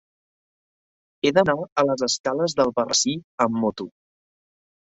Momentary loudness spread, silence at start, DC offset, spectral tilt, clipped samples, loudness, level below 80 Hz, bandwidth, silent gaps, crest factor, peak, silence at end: 6 LU; 1.25 s; under 0.1%; -3.5 dB/octave; under 0.1%; -22 LUFS; -62 dBFS; 8 kHz; 1.72-1.76 s, 2.20-2.24 s, 3.24-3.38 s; 20 dB; -4 dBFS; 1 s